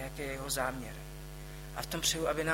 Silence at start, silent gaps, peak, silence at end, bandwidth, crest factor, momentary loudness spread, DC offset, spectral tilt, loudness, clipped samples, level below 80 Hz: 0 s; none; -16 dBFS; 0 s; 16.5 kHz; 20 dB; 16 LU; under 0.1%; -3 dB/octave; -35 LUFS; under 0.1%; -48 dBFS